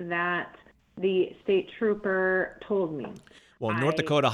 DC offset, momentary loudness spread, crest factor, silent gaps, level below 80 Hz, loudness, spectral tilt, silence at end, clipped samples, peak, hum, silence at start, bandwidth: under 0.1%; 9 LU; 18 dB; none; -64 dBFS; -28 LUFS; -6.5 dB/octave; 0 s; under 0.1%; -10 dBFS; none; 0 s; 10.5 kHz